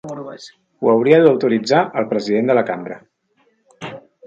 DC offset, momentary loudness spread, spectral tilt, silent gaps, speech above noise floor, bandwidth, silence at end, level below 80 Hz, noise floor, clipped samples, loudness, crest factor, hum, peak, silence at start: under 0.1%; 22 LU; -6.5 dB/octave; none; 46 dB; 7.6 kHz; 0 s; -66 dBFS; -62 dBFS; under 0.1%; -16 LUFS; 18 dB; none; 0 dBFS; 0.05 s